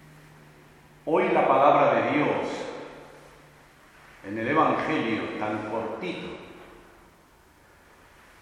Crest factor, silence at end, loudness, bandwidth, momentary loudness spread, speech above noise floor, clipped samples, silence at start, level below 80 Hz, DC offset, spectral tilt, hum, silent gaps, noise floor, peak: 22 dB; 1.7 s; -25 LUFS; 13.5 kHz; 22 LU; 32 dB; under 0.1%; 1.05 s; -62 dBFS; under 0.1%; -6.5 dB/octave; none; none; -57 dBFS; -6 dBFS